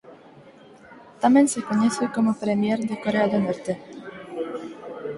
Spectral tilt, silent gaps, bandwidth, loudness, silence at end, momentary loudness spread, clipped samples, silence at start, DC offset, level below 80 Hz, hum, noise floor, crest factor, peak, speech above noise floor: -5.5 dB/octave; none; 11.5 kHz; -23 LUFS; 0 s; 17 LU; under 0.1%; 0.05 s; under 0.1%; -64 dBFS; none; -48 dBFS; 18 dB; -6 dBFS; 27 dB